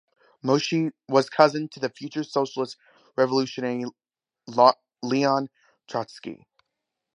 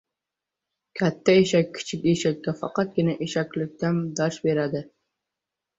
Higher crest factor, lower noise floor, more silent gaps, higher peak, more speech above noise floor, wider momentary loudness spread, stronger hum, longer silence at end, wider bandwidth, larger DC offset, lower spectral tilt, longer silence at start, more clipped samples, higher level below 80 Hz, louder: about the same, 24 dB vs 20 dB; second, -83 dBFS vs -87 dBFS; neither; first, -2 dBFS vs -6 dBFS; second, 59 dB vs 63 dB; first, 16 LU vs 10 LU; neither; second, 0.8 s vs 0.95 s; first, 10.5 kHz vs 8 kHz; neither; about the same, -5.5 dB/octave vs -6 dB/octave; second, 0.45 s vs 0.95 s; neither; second, -76 dBFS vs -62 dBFS; about the same, -24 LUFS vs -24 LUFS